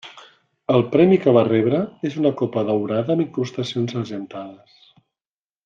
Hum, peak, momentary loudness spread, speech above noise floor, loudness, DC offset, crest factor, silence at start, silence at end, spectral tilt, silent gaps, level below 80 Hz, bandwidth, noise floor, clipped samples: none; -2 dBFS; 18 LU; over 71 dB; -20 LUFS; under 0.1%; 18 dB; 0.05 s; 1.1 s; -8 dB/octave; none; -64 dBFS; 7.4 kHz; under -90 dBFS; under 0.1%